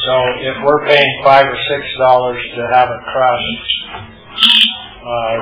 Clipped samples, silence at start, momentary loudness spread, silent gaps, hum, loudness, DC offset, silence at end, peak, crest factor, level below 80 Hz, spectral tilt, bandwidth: 0.3%; 0 s; 12 LU; none; none; -12 LUFS; under 0.1%; 0 s; 0 dBFS; 14 dB; -44 dBFS; -5.5 dB/octave; 5.4 kHz